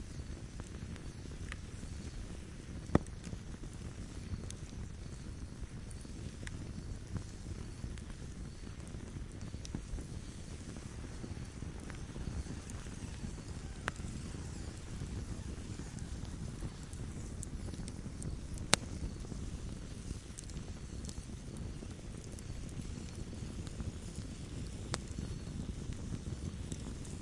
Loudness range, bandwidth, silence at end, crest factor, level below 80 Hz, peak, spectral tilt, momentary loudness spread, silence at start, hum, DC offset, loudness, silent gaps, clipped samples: 6 LU; 11.5 kHz; 0 s; 42 dB; -48 dBFS; 0 dBFS; -4.5 dB/octave; 5 LU; 0 s; none; under 0.1%; -44 LUFS; none; under 0.1%